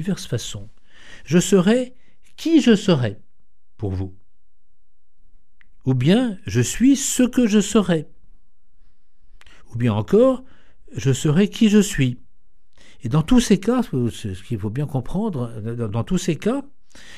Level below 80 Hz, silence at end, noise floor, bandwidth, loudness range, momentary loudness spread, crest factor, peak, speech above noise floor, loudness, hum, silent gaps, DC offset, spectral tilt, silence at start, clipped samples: -40 dBFS; 0 s; -65 dBFS; 14.5 kHz; 5 LU; 13 LU; 18 dB; -2 dBFS; 46 dB; -20 LUFS; none; none; 1%; -6 dB/octave; 0 s; under 0.1%